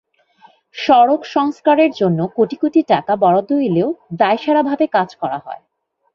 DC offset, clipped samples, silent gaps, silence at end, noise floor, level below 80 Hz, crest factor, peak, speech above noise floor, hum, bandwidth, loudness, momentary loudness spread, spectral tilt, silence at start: under 0.1%; under 0.1%; none; 0.6 s; -50 dBFS; -60 dBFS; 14 dB; -2 dBFS; 35 dB; none; 7 kHz; -16 LUFS; 11 LU; -7.5 dB/octave; 0.75 s